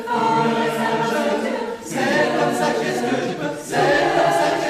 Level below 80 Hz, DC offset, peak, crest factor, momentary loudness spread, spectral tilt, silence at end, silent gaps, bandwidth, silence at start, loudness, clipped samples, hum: -56 dBFS; under 0.1%; -4 dBFS; 14 dB; 7 LU; -4.5 dB/octave; 0 s; none; 15.5 kHz; 0 s; -20 LUFS; under 0.1%; none